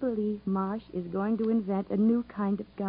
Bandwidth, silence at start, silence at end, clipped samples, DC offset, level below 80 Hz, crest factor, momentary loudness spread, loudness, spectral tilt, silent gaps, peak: 5 kHz; 0 s; 0 s; under 0.1%; under 0.1%; -60 dBFS; 12 dB; 6 LU; -30 LUFS; -12.5 dB/octave; none; -16 dBFS